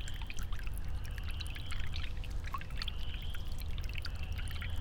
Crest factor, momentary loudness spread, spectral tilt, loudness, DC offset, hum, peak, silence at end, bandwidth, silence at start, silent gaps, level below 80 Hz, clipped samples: 14 dB; 2 LU; -4 dB/octave; -42 LUFS; under 0.1%; none; -22 dBFS; 0 s; 18 kHz; 0 s; none; -40 dBFS; under 0.1%